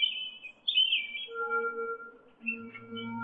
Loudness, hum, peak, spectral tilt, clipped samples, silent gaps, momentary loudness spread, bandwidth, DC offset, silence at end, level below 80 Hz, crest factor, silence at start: -31 LUFS; none; -16 dBFS; 1.5 dB/octave; under 0.1%; none; 16 LU; 4.7 kHz; under 0.1%; 0 s; -80 dBFS; 18 dB; 0 s